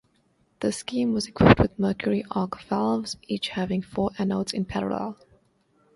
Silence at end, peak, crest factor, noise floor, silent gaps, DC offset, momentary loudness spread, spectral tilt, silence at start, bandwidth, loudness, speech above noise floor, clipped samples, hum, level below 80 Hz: 0.8 s; 0 dBFS; 26 dB; -66 dBFS; none; under 0.1%; 11 LU; -6 dB/octave; 0.6 s; 11.5 kHz; -25 LUFS; 42 dB; under 0.1%; none; -44 dBFS